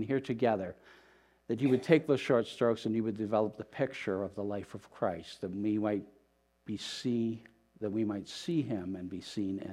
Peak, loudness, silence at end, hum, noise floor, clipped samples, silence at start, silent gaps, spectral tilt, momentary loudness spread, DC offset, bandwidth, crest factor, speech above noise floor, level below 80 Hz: -10 dBFS; -34 LUFS; 0 s; none; -70 dBFS; under 0.1%; 0 s; none; -6.5 dB/octave; 12 LU; under 0.1%; 13 kHz; 24 dB; 37 dB; -72 dBFS